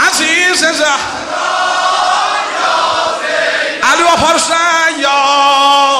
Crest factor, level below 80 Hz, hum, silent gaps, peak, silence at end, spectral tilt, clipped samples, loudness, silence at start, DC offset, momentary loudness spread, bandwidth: 12 dB; -48 dBFS; none; none; 0 dBFS; 0 s; -0.5 dB/octave; under 0.1%; -10 LUFS; 0 s; under 0.1%; 5 LU; 15 kHz